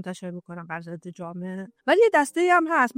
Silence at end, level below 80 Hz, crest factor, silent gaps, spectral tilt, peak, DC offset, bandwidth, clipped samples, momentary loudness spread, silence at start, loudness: 0.05 s; -76 dBFS; 16 dB; none; -5 dB/octave; -8 dBFS; under 0.1%; 16 kHz; under 0.1%; 18 LU; 0 s; -20 LUFS